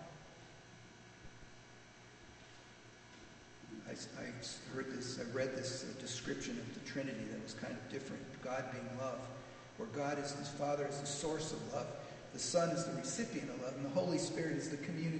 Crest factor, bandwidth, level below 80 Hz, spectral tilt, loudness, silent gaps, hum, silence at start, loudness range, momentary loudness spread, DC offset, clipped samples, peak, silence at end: 22 dB; 9 kHz; -70 dBFS; -4.5 dB/octave; -42 LUFS; none; none; 0 s; 14 LU; 20 LU; under 0.1%; under 0.1%; -22 dBFS; 0 s